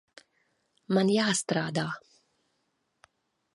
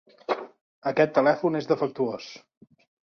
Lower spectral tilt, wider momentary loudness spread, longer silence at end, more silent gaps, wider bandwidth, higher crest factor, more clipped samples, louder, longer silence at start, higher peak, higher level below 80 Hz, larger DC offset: second, -4.5 dB/octave vs -6.5 dB/octave; second, 11 LU vs 16 LU; first, 1.55 s vs 0.7 s; second, none vs 0.61-0.82 s; first, 11.5 kHz vs 6.8 kHz; about the same, 20 dB vs 20 dB; neither; second, -28 LUFS vs -25 LUFS; first, 0.9 s vs 0.3 s; second, -12 dBFS vs -6 dBFS; about the same, -74 dBFS vs -72 dBFS; neither